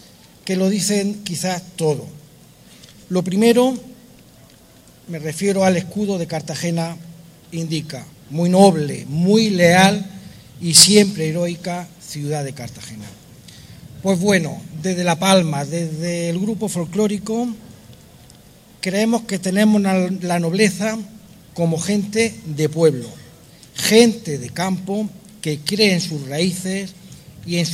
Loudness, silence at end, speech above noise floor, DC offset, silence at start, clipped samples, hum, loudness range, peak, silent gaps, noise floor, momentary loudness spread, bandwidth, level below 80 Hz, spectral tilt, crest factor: -18 LUFS; 0 s; 29 dB; under 0.1%; 0.45 s; under 0.1%; none; 9 LU; 0 dBFS; none; -47 dBFS; 18 LU; 16 kHz; -56 dBFS; -4 dB/octave; 20 dB